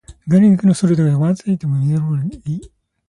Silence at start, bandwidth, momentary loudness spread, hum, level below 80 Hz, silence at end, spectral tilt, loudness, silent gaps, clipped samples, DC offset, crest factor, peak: 0.1 s; 11 kHz; 13 LU; none; -48 dBFS; 0.4 s; -8.5 dB/octave; -16 LUFS; none; under 0.1%; under 0.1%; 14 dB; -2 dBFS